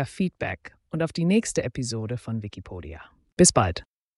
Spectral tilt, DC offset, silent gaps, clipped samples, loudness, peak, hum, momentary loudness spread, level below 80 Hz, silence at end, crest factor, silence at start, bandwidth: -4.5 dB/octave; under 0.1%; 3.32-3.37 s; under 0.1%; -24 LUFS; -4 dBFS; none; 21 LU; -48 dBFS; 0.35 s; 22 dB; 0 s; 11.5 kHz